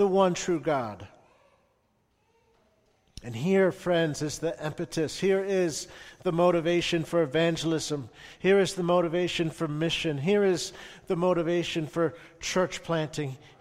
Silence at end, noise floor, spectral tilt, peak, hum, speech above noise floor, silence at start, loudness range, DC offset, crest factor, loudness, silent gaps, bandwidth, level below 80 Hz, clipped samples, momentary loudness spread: 0.25 s; -71 dBFS; -5 dB/octave; -10 dBFS; none; 43 dB; 0 s; 5 LU; under 0.1%; 18 dB; -27 LUFS; none; 15 kHz; -58 dBFS; under 0.1%; 12 LU